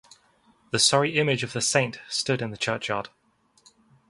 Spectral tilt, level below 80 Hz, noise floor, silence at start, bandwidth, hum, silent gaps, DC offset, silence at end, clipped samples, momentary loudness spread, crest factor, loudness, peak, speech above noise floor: -3 dB/octave; -64 dBFS; -62 dBFS; 0.75 s; 11.5 kHz; none; none; under 0.1%; 1.05 s; under 0.1%; 11 LU; 24 dB; -24 LUFS; -4 dBFS; 37 dB